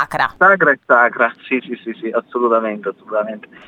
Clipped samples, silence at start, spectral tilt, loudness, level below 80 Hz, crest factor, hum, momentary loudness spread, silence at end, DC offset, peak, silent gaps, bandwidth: under 0.1%; 0 s; -6 dB/octave; -16 LUFS; -58 dBFS; 16 dB; none; 13 LU; 0.3 s; under 0.1%; 0 dBFS; none; 12.5 kHz